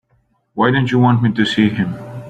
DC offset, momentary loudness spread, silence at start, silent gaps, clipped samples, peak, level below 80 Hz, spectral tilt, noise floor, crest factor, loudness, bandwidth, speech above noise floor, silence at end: under 0.1%; 9 LU; 0.55 s; none; under 0.1%; -2 dBFS; -50 dBFS; -7 dB/octave; -61 dBFS; 14 dB; -15 LUFS; 9 kHz; 46 dB; 0 s